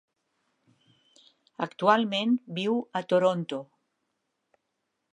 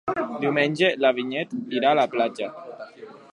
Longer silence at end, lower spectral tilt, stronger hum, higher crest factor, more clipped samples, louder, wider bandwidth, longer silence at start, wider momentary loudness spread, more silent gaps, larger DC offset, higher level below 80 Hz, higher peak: first, 1.5 s vs 0.15 s; about the same, -6 dB/octave vs -5.5 dB/octave; neither; about the same, 22 dB vs 18 dB; neither; second, -27 LUFS vs -23 LUFS; second, 9.8 kHz vs 11 kHz; first, 1.6 s vs 0.05 s; second, 12 LU vs 19 LU; neither; neither; second, -84 dBFS vs -70 dBFS; about the same, -8 dBFS vs -6 dBFS